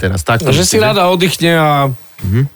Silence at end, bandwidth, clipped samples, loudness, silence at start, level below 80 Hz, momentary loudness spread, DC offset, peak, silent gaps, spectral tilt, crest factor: 0.1 s; 19.5 kHz; under 0.1%; -11 LUFS; 0 s; -36 dBFS; 7 LU; under 0.1%; -2 dBFS; none; -4.5 dB/octave; 10 dB